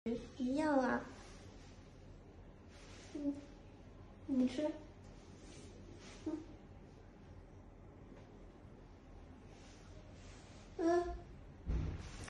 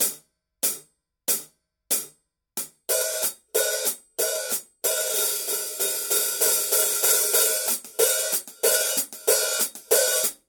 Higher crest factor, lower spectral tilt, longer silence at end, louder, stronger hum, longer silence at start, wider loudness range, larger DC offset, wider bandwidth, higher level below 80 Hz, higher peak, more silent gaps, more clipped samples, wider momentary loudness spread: about the same, 20 dB vs 20 dB; first, -6.5 dB/octave vs 1.5 dB/octave; second, 0 s vs 0.15 s; second, -40 LUFS vs -22 LUFS; neither; about the same, 0.05 s vs 0 s; first, 16 LU vs 6 LU; neither; second, 11 kHz vs 18 kHz; first, -54 dBFS vs -74 dBFS; second, -24 dBFS vs -6 dBFS; neither; neither; first, 23 LU vs 8 LU